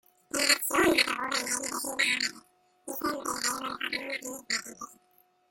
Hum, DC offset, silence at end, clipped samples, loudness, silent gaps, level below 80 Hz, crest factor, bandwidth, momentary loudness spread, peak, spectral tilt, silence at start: none; under 0.1%; 0.55 s; under 0.1%; -28 LUFS; none; -64 dBFS; 24 dB; 17 kHz; 14 LU; -8 dBFS; -0.5 dB/octave; 0.35 s